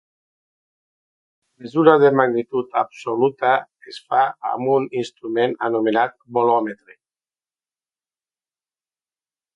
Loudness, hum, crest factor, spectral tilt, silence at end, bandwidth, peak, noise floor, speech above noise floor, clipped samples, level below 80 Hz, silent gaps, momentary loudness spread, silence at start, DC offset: -19 LUFS; none; 22 dB; -7 dB/octave; 2.8 s; 9 kHz; 0 dBFS; under -90 dBFS; over 71 dB; under 0.1%; -72 dBFS; none; 12 LU; 1.6 s; under 0.1%